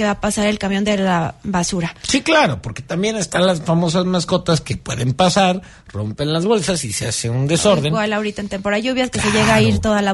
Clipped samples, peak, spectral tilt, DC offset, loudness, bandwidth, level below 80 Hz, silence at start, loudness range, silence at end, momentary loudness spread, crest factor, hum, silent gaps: under 0.1%; -2 dBFS; -4.5 dB/octave; under 0.1%; -17 LUFS; 11.5 kHz; -40 dBFS; 0 s; 1 LU; 0 s; 9 LU; 14 dB; none; none